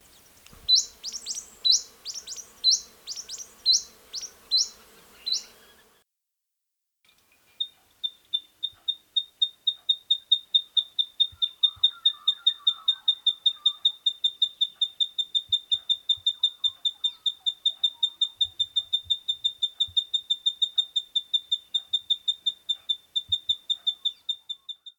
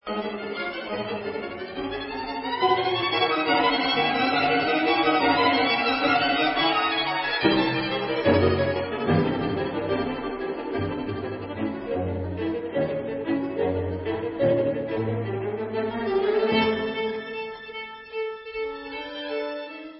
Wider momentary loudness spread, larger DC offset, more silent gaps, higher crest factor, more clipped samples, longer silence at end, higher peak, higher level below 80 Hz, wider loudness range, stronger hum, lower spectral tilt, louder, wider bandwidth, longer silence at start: about the same, 12 LU vs 11 LU; neither; neither; about the same, 20 dB vs 18 dB; neither; about the same, 0.1 s vs 0 s; about the same, -10 dBFS vs -8 dBFS; second, -68 dBFS vs -48 dBFS; about the same, 8 LU vs 8 LU; neither; second, 3 dB/octave vs -9.5 dB/octave; about the same, -25 LUFS vs -25 LUFS; first, 20 kHz vs 5.8 kHz; first, 0.7 s vs 0.05 s